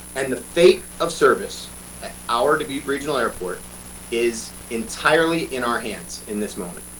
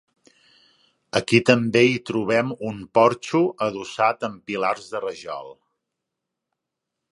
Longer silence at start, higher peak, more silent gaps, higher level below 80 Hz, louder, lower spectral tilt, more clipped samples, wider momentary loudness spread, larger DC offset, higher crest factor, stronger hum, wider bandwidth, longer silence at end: second, 0 s vs 1.15 s; second, -4 dBFS vs 0 dBFS; neither; first, -46 dBFS vs -62 dBFS; about the same, -21 LUFS vs -21 LUFS; second, -3.5 dB/octave vs -5.5 dB/octave; neither; first, 17 LU vs 13 LU; neither; about the same, 18 dB vs 22 dB; first, 60 Hz at -45 dBFS vs none; first, 19 kHz vs 11.5 kHz; second, 0 s vs 1.6 s